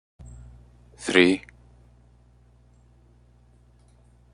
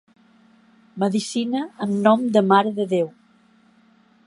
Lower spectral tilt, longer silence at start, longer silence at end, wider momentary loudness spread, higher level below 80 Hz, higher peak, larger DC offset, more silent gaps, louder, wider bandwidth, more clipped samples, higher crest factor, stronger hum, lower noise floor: second, -4.5 dB/octave vs -6 dB/octave; about the same, 1 s vs 0.95 s; first, 2.95 s vs 1.2 s; first, 29 LU vs 9 LU; first, -54 dBFS vs -72 dBFS; about the same, -2 dBFS vs -2 dBFS; neither; neither; about the same, -21 LUFS vs -21 LUFS; about the same, 11 kHz vs 11.5 kHz; neither; first, 28 dB vs 20 dB; first, 60 Hz at -55 dBFS vs none; about the same, -56 dBFS vs -57 dBFS